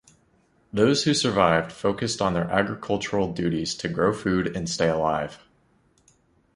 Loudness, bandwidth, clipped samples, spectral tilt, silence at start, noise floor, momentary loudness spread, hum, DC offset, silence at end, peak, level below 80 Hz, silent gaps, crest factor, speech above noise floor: -24 LUFS; 11.5 kHz; under 0.1%; -5 dB/octave; 0.75 s; -63 dBFS; 7 LU; none; under 0.1%; 1.2 s; -4 dBFS; -50 dBFS; none; 22 dB; 39 dB